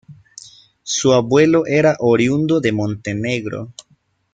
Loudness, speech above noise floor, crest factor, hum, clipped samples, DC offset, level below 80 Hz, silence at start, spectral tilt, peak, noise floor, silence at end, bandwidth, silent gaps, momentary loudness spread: -16 LUFS; 44 dB; 16 dB; none; under 0.1%; under 0.1%; -54 dBFS; 0.1 s; -5 dB/octave; -2 dBFS; -59 dBFS; 0.6 s; 9.2 kHz; none; 14 LU